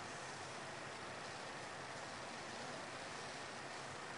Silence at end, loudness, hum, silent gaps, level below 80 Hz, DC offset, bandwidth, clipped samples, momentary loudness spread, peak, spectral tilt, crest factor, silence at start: 0 s; -48 LUFS; none; none; -78 dBFS; under 0.1%; 10.5 kHz; under 0.1%; 1 LU; -36 dBFS; -2.5 dB/octave; 14 dB; 0 s